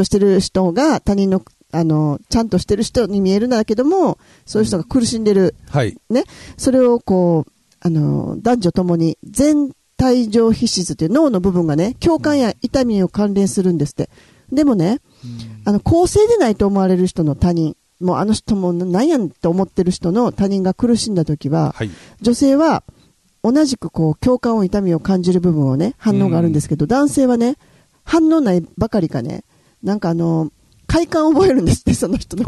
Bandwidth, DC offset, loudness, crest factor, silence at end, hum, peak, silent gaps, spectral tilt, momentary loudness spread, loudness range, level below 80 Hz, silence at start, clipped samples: 12.5 kHz; under 0.1%; -16 LUFS; 14 dB; 0 s; none; -2 dBFS; none; -6.5 dB/octave; 7 LU; 2 LU; -38 dBFS; 0 s; under 0.1%